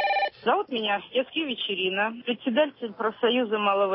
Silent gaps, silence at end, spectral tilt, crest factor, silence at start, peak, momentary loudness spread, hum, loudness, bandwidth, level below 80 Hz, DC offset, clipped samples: none; 0 s; -8.5 dB/octave; 14 dB; 0 s; -12 dBFS; 4 LU; none; -26 LUFS; 5.8 kHz; -74 dBFS; under 0.1%; under 0.1%